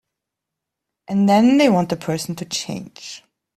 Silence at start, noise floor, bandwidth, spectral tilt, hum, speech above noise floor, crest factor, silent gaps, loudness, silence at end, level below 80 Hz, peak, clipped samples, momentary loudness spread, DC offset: 1.1 s; -83 dBFS; 14 kHz; -5.5 dB/octave; none; 65 dB; 18 dB; none; -18 LUFS; 0.4 s; -60 dBFS; -4 dBFS; under 0.1%; 21 LU; under 0.1%